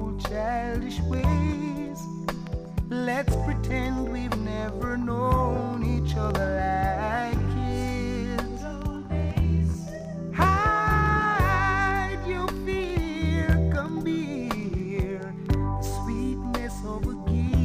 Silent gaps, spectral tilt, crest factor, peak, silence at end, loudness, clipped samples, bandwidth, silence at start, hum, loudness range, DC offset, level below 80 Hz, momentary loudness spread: none; -7 dB/octave; 16 dB; -8 dBFS; 0 s; -27 LUFS; under 0.1%; 15.5 kHz; 0 s; none; 5 LU; under 0.1%; -32 dBFS; 10 LU